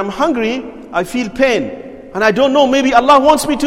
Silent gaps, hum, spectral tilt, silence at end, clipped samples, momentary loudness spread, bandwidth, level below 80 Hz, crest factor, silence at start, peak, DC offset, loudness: none; none; -4 dB/octave; 0 s; under 0.1%; 14 LU; 16.5 kHz; -42 dBFS; 14 dB; 0 s; 0 dBFS; under 0.1%; -13 LUFS